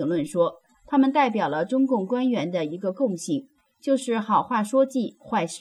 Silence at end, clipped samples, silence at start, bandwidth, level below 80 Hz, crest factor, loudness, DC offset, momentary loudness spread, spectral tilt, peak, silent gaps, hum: 0 s; under 0.1%; 0 s; 12 kHz; -68 dBFS; 14 dB; -24 LUFS; under 0.1%; 7 LU; -5.5 dB/octave; -10 dBFS; none; none